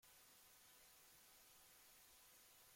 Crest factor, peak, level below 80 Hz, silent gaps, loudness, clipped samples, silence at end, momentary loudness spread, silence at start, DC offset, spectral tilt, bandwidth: 14 dB; -56 dBFS; -88 dBFS; none; -66 LUFS; under 0.1%; 0 s; 0 LU; 0 s; under 0.1%; 0 dB/octave; 16.5 kHz